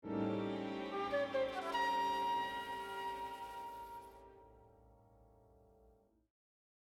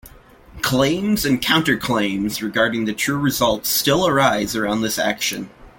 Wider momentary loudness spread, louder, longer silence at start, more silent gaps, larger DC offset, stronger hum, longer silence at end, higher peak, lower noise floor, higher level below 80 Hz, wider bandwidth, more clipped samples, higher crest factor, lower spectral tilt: first, 15 LU vs 6 LU; second, -40 LUFS vs -19 LUFS; about the same, 0.05 s vs 0.05 s; neither; neither; neither; first, 1.65 s vs 0.1 s; second, -26 dBFS vs -2 dBFS; first, -70 dBFS vs -45 dBFS; second, -70 dBFS vs -46 dBFS; about the same, 16.5 kHz vs 17 kHz; neither; about the same, 16 dB vs 18 dB; about the same, -5 dB/octave vs -4 dB/octave